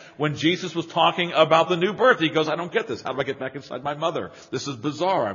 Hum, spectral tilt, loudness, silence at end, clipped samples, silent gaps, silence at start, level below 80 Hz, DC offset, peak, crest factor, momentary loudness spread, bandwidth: none; -3 dB/octave; -23 LUFS; 0 s; under 0.1%; none; 0 s; -66 dBFS; under 0.1%; -2 dBFS; 22 dB; 13 LU; 7.2 kHz